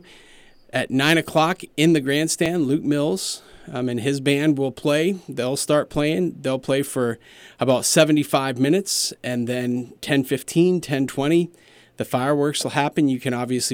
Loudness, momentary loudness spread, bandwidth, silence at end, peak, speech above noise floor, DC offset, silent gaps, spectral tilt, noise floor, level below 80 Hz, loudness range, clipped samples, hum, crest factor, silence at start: -21 LUFS; 9 LU; 17.5 kHz; 0 s; -6 dBFS; 28 dB; under 0.1%; none; -4.5 dB/octave; -49 dBFS; -56 dBFS; 2 LU; under 0.1%; none; 16 dB; 0.75 s